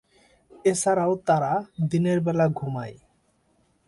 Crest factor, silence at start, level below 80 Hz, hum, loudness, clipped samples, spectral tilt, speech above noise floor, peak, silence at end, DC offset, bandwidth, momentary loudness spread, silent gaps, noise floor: 16 dB; 0.65 s; -62 dBFS; none; -24 LUFS; under 0.1%; -6.5 dB/octave; 43 dB; -8 dBFS; 0.95 s; under 0.1%; 11.5 kHz; 9 LU; none; -66 dBFS